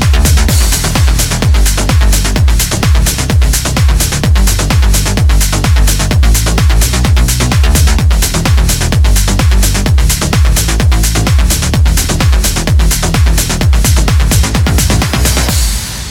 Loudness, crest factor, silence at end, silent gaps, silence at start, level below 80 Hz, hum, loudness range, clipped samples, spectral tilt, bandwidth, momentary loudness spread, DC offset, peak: -10 LUFS; 8 dB; 0 s; none; 0 s; -10 dBFS; none; 1 LU; under 0.1%; -4 dB/octave; 18 kHz; 2 LU; under 0.1%; 0 dBFS